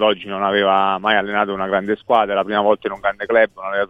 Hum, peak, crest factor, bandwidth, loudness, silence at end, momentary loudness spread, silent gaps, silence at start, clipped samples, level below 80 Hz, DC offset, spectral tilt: none; 0 dBFS; 16 dB; 5 kHz; -18 LUFS; 0.05 s; 5 LU; none; 0 s; under 0.1%; -54 dBFS; under 0.1%; -6.5 dB/octave